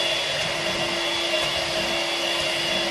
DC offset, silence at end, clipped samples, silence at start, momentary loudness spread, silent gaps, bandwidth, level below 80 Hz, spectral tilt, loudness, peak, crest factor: under 0.1%; 0 s; under 0.1%; 0 s; 1 LU; none; 13.5 kHz; -52 dBFS; -2 dB/octave; -23 LUFS; -12 dBFS; 14 dB